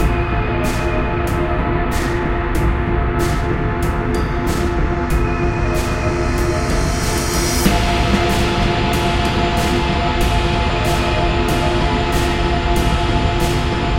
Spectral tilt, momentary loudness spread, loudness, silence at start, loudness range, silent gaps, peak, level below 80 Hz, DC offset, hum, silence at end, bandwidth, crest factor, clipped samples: -5.5 dB/octave; 3 LU; -18 LUFS; 0 s; 2 LU; none; 0 dBFS; -22 dBFS; under 0.1%; none; 0 s; 16.5 kHz; 16 dB; under 0.1%